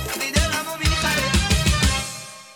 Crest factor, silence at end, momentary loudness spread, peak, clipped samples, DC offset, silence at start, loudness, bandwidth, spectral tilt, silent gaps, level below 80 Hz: 18 dB; 0 s; 7 LU; -4 dBFS; under 0.1%; under 0.1%; 0 s; -20 LUFS; over 20 kHz; -3.5 dB/octave; none; -26 dBFS